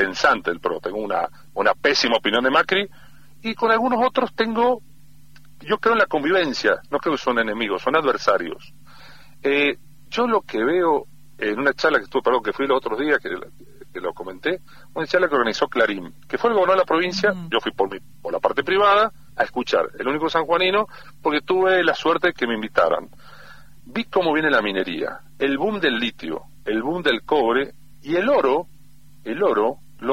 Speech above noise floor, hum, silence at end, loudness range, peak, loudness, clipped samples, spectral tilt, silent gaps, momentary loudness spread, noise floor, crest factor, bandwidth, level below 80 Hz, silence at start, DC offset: 31 dB; none; 0 s; 3 LU; -2 dBFS; -21 LUFS; under 0.1%; -4.5 dB/octave; none; 12 LU; -52 dBFS; 20 dB; 16 kHz; -56 dBFS; 0 s; 0.7%